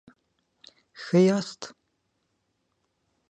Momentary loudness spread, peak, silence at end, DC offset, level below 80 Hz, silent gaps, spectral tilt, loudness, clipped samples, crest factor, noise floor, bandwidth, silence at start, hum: 21 LU; -10 dBFS; 1.6 s; under 0.1%; -78 dBFS; none; -6.5 dB/octave; -23 LUFS; under 0.1%; 20 dB; -75 dBFS; 9.4 kHz; 1 s; none